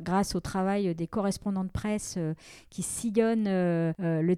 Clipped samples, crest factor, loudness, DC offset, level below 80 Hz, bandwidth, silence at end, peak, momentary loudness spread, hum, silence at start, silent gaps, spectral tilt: under 0.1%; 16 dB; -29 LUFS; under 0.1%; -50 dBFS; 15 kHz; 0 s; -12 dBFS; 8 LU; none; 0 s; none; -6 dB/octave